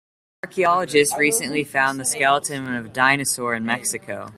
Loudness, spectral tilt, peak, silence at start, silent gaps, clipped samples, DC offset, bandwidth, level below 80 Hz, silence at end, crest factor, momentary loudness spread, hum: -20 LUFS; -2.5 dB/octave; -2 dBFS; 0.45 s; none; under 0.1%; under 0.1%; 16 kHz; -62 dBFS; 0.05 s; 20 dB; 10 LU; none